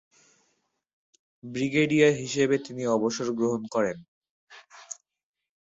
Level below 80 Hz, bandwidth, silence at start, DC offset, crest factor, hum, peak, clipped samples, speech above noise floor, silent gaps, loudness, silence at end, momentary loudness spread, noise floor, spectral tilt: -68 dBFS; 8 kHz; 1.45 s; under 0.1%; 20 dB; none; -8 dBFS; under 0.1%; 49 dB; 4.08-4.22 s, 4.30-4.47 s; -26 LUFS; 0.85 s; 21 LU; -74 dBFS; -5 dB/octave